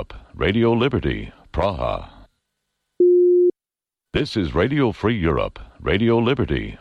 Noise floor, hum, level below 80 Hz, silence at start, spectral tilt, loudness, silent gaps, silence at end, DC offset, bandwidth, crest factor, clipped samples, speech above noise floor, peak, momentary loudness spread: -90 dBFS; none; -36 dBFS; 0 s; -8 dB/octave; -20 LUFS; none; 0.05 s; under 0.1%; 6.4 kHz; 12 dB; under 0.1%; 69 dB; -8 dBFS; 12 LU